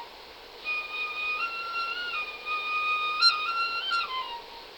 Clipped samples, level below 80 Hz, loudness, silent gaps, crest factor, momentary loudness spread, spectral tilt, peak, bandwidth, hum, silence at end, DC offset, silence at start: under 0.1%; -66 dBFS; -28 LUFS; none; 20 dB; 16 LU; 0.5 dB/octave; -10 dBFS; over 20 kHz; none; 0 s; under 0.1%; 0 s